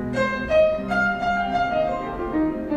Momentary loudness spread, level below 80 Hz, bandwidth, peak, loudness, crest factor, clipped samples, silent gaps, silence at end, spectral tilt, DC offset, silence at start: 6 LU; -42 dBFS; 10 kHz; -8 dBFS; -22 LUFS; 14 dB; under 0.1%; none; 0 s; -6.5 dB/octave; under 0.1%; 0 s